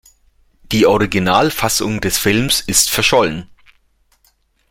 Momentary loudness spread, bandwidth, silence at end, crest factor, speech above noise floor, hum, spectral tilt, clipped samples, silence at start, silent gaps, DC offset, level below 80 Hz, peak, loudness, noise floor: 5 LU; 16.5 kHz; 1.25 s; 16 dB; 44 dB; none; -3 dB/octave; under 0.1%; 0.7 s; none; under 0.1%; -38 dBFS; 0 dBFS; -14 LUFS; -59 dBFS